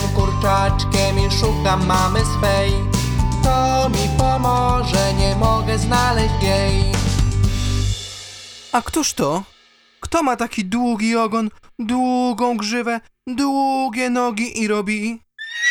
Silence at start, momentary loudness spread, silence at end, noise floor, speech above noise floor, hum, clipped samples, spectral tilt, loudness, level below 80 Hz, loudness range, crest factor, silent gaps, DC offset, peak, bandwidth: 0 s; 7 LU; 0 s; -53 dBFS; 35 dB; none; under 0.1%; -5 dB/octave; -19 LUFS; -26 dBFS; 4 LU; 16 dB; none; under 0.1%; -2 dBFS; over 20 kHz